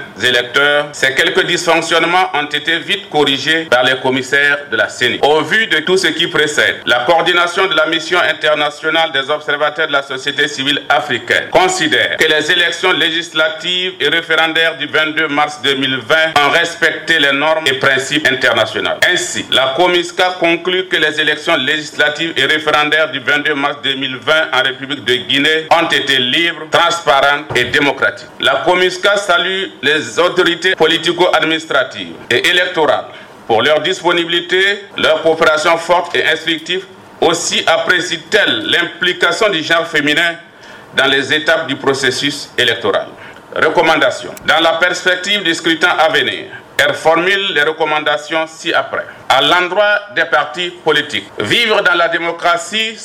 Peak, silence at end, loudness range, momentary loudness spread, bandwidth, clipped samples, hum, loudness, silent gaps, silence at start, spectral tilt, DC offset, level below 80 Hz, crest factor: 0 dBFS; 0 s; 2 LU; 5 LU; 16.5 kHz; under 0.1%; none; -12 LUFS; none; 0 s; -2.5 dB/octave; under 0.1%; -52 dBFS; 12 dB